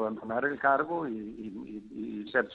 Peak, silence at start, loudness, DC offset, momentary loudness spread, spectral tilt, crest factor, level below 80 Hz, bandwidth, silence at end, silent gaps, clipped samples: -12 dBFS; 0 s; -31 LUFS; under 0.1%; 15 LU; -8 dB/octave; 20 dB; -66 dBFS; 5.6 kHz; 0 s; none; under 0.1%